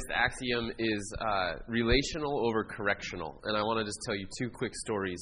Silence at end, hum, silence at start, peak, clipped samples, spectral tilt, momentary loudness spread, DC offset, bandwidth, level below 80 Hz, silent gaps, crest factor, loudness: 0 s; none; 0 s; -12 dBFS; under 0.1%; -4 dB/octave; 7 LU; under 0.1%; 11 kHz; -46 dBFS; none; 20 dB; -32 LUFS